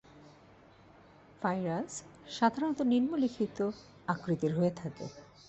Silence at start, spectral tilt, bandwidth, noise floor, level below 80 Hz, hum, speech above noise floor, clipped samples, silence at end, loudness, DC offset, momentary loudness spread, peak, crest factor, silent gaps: 0.15 s; -6.5 dB/octave; 8.2 kHz; -59 dBFS; -68 dBFS; none; 26 dB; under 0.1%; 0.25 s; -33 LUFS; under 0.1%; 14 LU; -12 dBFS; 22 dB; none